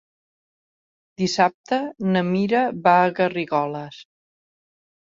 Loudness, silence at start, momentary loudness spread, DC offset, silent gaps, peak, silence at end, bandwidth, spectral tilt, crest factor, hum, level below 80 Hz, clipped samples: -21 LUFS; 1.2 s; 10 LU; under 0.1%; 1.54-1.64 s; -4 dBFS; 1 s; 7.6 kHz; -6 dB/octave; 20 dB; none; -66 dBFS; under 0.1%